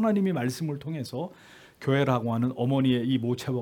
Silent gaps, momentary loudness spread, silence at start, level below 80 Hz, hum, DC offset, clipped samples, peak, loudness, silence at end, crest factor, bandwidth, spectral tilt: none; 10 LU; 0 s; -66 dBFS; none; under 0.1%; under 0.1%; -10 dBFS; -27 LUFS; 0 s; 18 dB; 17.5 kHz; -7 dB/octave